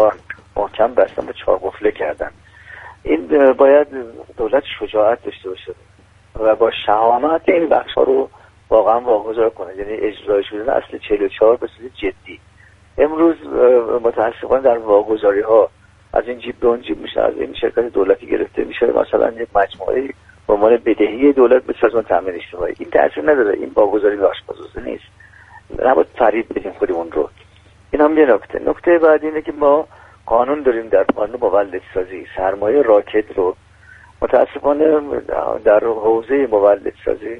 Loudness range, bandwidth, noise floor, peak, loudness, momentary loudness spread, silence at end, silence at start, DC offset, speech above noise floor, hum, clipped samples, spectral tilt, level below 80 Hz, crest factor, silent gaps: 3 LU; 4.1 kHz; -47 dBFS; 0 dBFS; -16 LUFS; 13 LU; 0 s; 0 s; under 0.1%; 31 dB; none; under 0.1%; -7 dB/octave; -44 dBFS; 16 dB; none